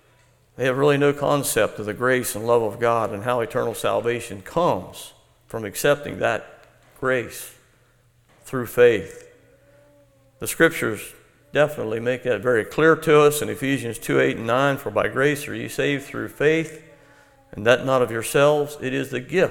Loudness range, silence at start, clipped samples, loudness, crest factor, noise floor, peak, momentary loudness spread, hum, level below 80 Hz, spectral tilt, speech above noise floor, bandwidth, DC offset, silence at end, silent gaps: 5 LU; 0.6 s; under 0.1%; -21 LUFS; 22 dB; -59 dBFS; -2 dBFS; 12 LU; none; -54 dBFS; -4.5 dB/octave; 38 dB; 18.5 kHz; under 0.1%; 0 s; none